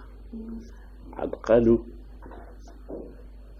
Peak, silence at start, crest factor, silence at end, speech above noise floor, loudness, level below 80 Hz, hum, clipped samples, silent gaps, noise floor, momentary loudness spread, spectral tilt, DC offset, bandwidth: -8 dBFS; 0 s; 22 dB; 0 s; 19 dB; -23 LUFS; -42 dBFS; none; under 0.1%; none; -44 dBFS; 27 LU; -8.5 dB/octave; under 0.1%; 7 kHz